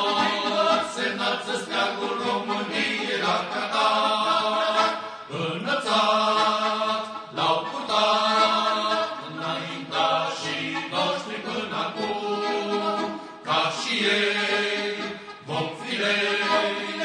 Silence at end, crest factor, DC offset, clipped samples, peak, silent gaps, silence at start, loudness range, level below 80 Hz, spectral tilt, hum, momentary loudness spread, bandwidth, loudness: 0 s; 16 dB; under 0.1%; under 0.1%; -8 dBFS; none; 0 s; 4 LU; -70 dBFS; -3 dB/octave; none; 9 LU; 10.5 kHz; -24 LUFS